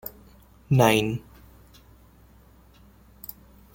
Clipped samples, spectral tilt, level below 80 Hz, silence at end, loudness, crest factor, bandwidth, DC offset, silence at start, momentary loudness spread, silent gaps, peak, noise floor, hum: under 0.1%; -5.5 dB/octave; -54 dBFS; 2.55 s; -22 LUFS; 26 dB; 17 kHz; under 0.1%; 0.05 s; 22 LU; none; -4 dBFS; -54 dBFS; none